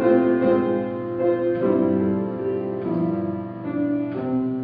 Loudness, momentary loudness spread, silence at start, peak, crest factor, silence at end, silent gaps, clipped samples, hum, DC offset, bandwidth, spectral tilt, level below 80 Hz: -23 LUFS; 8 LU; 0 s; -6 dBFS; 14 dB; 0 s; none; under 0.1%; none; under 0.1%; 4.6 kHz; -12 dB/octave; -58 dBFS